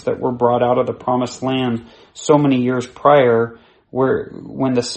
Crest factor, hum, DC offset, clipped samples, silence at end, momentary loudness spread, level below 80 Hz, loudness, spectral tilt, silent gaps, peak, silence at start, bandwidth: 18 dB; none; under 0.1%; under 0.1%; 0 s; 12 LU; -56 dBFS; -17 LUFS; -6 dB/octave; none; 0 dBFS; 0.05 s; 8.8 kHz